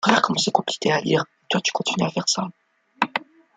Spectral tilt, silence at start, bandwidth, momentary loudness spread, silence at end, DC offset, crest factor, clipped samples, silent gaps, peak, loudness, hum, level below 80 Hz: -3.5 dB/octave; 0 s; 9.6 kHz; 6 LU; 0.35 s; under 0.1%; 22 dB; under 0.1%; none; 0 dBFS; -22 LUFS; none; -66 dBFS